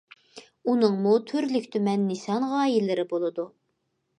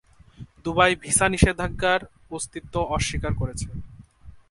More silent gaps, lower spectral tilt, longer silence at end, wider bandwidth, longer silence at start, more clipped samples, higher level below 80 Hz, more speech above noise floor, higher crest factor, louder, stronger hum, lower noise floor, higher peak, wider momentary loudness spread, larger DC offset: neither; first, -6.5 dB/octave vs -4 dB/octave; first, 0.7 s vs 0.1 s; about the same, 10.5 kHz vs 11.5 kHz; about the same, 0.35 s vs 0.4 s; neither; second, -80 dBFS vs -36 dBFS; first, 51 dB vs 24 dB; second, 18 dB vs 24 dB; about the same, -25 LUFS vs -23 LUFS; neither; first, -76 dBFS vs -47 dBFS; second, -8 dBFS vs -2 dBFS; second, 8 LU vs 15 LU; neither